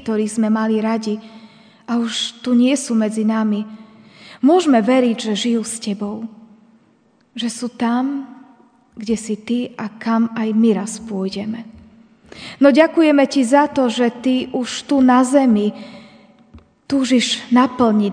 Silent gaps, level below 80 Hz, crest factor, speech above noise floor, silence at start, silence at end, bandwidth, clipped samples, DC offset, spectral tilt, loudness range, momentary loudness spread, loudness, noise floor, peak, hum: none; -58 dBFS; 18 dB; 40 dB; 0.05 s; 0 s; 10 kHz; under 0.1%; under 0.1%; -4.5 dB/octave; 8 LU; 14 LU; -17 LUFS; -56 dBFS; 0 dBFS; none